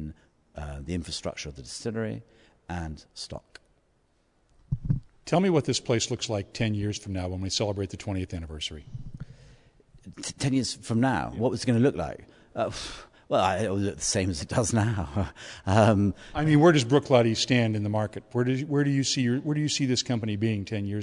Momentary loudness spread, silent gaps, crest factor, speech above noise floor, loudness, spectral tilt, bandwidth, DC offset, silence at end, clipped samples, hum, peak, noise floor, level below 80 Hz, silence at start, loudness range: 17 LU; none; 22 dB; 41 dB; -27 LUFS; -5 dB/octave; 11 kHz; under 0.1%; 0 s; under 0.1%; none; -6 dBFS; -68 dBFS; -50 dBFS; 0 s; 12 LU